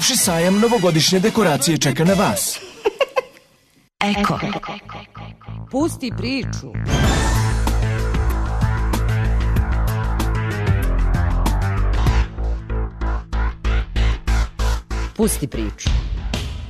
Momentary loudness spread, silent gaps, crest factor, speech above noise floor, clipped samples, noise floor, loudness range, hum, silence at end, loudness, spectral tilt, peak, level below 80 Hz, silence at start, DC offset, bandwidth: 11 LU; none; 14 dB; 38 dB; under 0.1%; -56 dBFS; 6 LU; none; 0 s; -20 LUFS; -4.5 dB/octave; -4 dBFS; -22 dBFS; 0 s; under 0.1%; 13.5 kHz